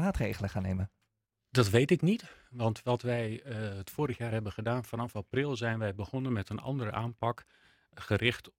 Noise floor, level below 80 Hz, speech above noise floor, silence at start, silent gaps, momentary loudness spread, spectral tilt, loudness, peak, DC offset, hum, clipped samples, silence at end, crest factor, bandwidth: -82 dBFS; -54 dBFS; 49 dB; 0 s; none; 11 LU; -6.5 dB/octave; -33 LUFS; -10 dBFS; under 0.1%; none; under 0.1%; 0.1 s; 22 dB; 16.5 kHz